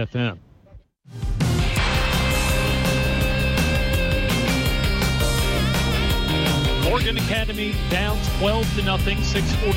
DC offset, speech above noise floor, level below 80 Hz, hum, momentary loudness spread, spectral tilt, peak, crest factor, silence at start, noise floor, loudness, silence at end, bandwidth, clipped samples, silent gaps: under 0.1%; 27 dB; -26 dBFS; none; 3 LU; -5 dB/octave; -8 dBFS; 12 dB; 0 s; -48 dBFS; -21 LUFS; 0 s; 16.5 kHz; under 0.1%; none